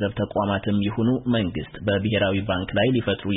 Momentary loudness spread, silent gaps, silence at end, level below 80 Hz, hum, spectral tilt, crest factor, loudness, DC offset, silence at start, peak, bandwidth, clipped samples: 4 LU; none; 0 s; -46 dBFS; none; -11.5 dB/octave; 14 dB; -23 LUFS; under 0.1%; 0 s; -8 dBFS; 4 kHz; under 0.1%